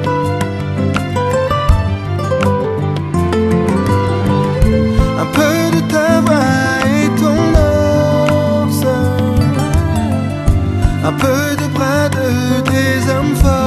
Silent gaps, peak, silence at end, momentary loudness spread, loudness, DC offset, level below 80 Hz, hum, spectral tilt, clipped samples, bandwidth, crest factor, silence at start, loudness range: none; 0 dBFS; 0 s; 5 LU; -14 LUFS; under 0.1%; -22 dBFS; none; -6.5 dB/octave; under 0.1%; 13 kHz; 12 dB; 0 s; 3 LU